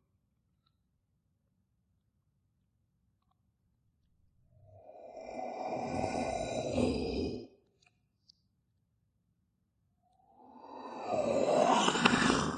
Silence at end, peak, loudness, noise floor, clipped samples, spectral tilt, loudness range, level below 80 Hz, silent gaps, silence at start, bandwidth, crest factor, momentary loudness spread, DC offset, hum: 0 s; -8 dBFS; -32 LUFS; -78 dBFS; under 0.1%; -4 dB/octave; 18 LU; -56 dBFS; none; 4.7 s; 9.6 kHz; 30 dB; 21 LU; under 0.1%; none